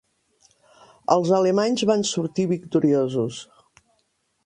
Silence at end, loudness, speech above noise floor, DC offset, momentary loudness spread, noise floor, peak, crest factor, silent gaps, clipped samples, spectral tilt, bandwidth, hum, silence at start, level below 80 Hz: 1.05 s; -22 LUFS; 49 dB; under 0.1%; 9 LU; -70 dBFS; -2 dBFS; 20 dB; none; under 0.1%; -5.5 dB/octave; 10.5 kHz; none; 1.1 s; -66 dBFS